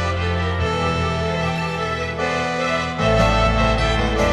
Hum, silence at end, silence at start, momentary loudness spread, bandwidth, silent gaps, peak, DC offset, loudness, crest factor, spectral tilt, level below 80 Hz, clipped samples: none; 0 s; 0 s; 6 LU; 11.5 kHz; none; -4 dBFS; under 0.1%; -20 LUFS; 16 dB; -5.5 dB/octave; -28 dBFS; under 0.1%